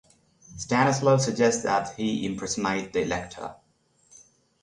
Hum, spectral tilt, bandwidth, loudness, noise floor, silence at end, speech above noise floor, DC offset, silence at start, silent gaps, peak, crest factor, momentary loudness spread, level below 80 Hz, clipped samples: none; -4.5 dB/octave; 11 kHz; -25 LUFS; -65 dBFS; 1.1 s; 40 dB; under 0.1%; 0.5 s; none; -8 dBFS; 20 dB; 16 LU; -56 dBFS; under 0.1%